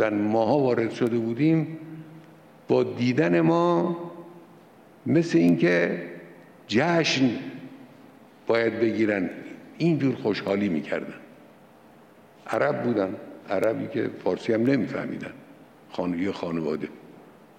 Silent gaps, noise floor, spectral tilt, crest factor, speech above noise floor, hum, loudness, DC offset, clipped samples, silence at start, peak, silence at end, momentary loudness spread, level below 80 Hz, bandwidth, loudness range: none; -52 dBFS; -6.5 dB/octave; 16 dB; 29 dB; none; -25 LUFS; under 0.1%; under 0.1%; 0 s; -10 dBFS; 0.35 s; 18 LU; -68 dBFS; 9.2 kHz; 5 LU